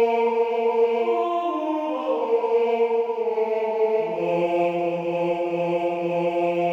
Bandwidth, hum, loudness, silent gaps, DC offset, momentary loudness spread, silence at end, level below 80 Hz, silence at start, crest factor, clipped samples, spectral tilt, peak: 7 kHz; none; -23 LUFS; none; under 0.1%; 4 LU; 0 s; -72 dBFS; 0 s; 12 dB; under 0.1%; -7.5 dB/octave; -10 dBFS